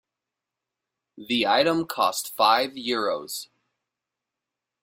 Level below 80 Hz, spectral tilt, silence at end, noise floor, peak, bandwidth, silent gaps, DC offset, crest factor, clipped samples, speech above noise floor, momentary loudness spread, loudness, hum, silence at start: -70 dBFS; -3 dB/octave; 1.4 s; -87 dBFS; -4 dBFS; 16.5 kHz; none; under 0.1%; 22 dB; under 0.1%; 63 dB; 10 LU; -23 LUFS; none; 1.15 s